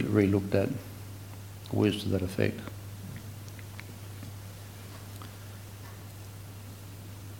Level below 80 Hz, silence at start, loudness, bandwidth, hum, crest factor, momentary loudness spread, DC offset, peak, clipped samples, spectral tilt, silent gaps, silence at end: -58 dBFS; 0 s; -33 LUFS; 17 kHz; none; 24 dB; 17 LU; under 0.1%; -10 dBFS; under 0.1%; -6.5 dB/octave; none; 0 s